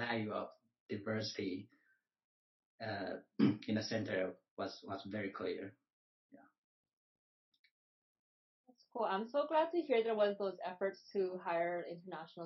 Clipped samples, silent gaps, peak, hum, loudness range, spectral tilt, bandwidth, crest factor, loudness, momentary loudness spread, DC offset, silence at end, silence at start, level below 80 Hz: under 0.1%; 0.80-0.89 s, 2.24-2.78 s, 4.51-4.57 s, 5.93-6.29 s, 6.58-6.84 s, 6.93-7.52 s, 7.59-7.64 s, 7.71-8.64 s; -20 dBFS; none; 11 LU; -4.5 dB/octave; 6 kHz; 20 dB; -39 LUFS; 13 LU; under 0.1%; 0 s; 0 s; -88 dBFS